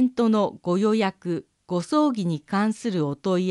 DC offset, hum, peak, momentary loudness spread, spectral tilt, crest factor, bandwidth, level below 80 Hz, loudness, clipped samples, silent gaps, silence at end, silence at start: under 0.1%; none; -8 dBFS; 9 LU; -7 dB/octave; 14 dB; 11.5 kHz; -68 dBFS; -24 LUFS; under 0.1%; none; 0 s; 0 s